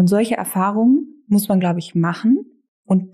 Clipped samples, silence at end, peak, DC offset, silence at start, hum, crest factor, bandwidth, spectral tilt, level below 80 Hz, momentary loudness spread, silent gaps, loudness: under 0.1%; 0.05 s; -8 dBFS; under 0.1%; 0 s; none; 10 dB; 15 kHz; -7 dB/octave; -64 dBFS; 4 LU; 2.68-2.83 s; -18 LUFS